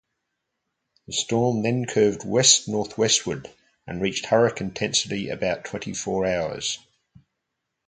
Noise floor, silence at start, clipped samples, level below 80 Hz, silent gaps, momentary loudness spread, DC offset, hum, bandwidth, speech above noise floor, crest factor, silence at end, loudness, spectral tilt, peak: -81 dBFS; 1.1 s; under 0.1%; -56 dBFS; none; 12 LU; under 0.1%; none; 9.6 kHz; 57 dB; 24 dB; 1.1 s; -23 LUFS; -3 dB/octave; -2 dBFS